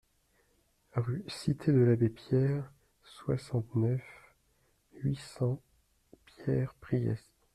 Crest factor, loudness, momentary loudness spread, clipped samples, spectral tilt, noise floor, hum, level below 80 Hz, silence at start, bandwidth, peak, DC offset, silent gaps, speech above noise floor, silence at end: 18 dB; -33 LUFS; 13 LU; under 0.1%; -8.5 dB/octave; -72 dBFS; none; -62 dBFS; 0.95 s; 12 kHz; -16 dBFS; under 0.1%; none; 41 dB; 0.35 s